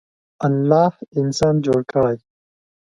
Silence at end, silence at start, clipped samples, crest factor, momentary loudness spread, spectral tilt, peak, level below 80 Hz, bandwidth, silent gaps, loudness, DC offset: 0.8 s; 0.4 s; under 0.1%; 18 dB; 7 LU; -7 dB/octave; -2 dBFS; -52 dBFS; 11 kHz; 1.08-1.12 s; -19 LUFS; under 0.1%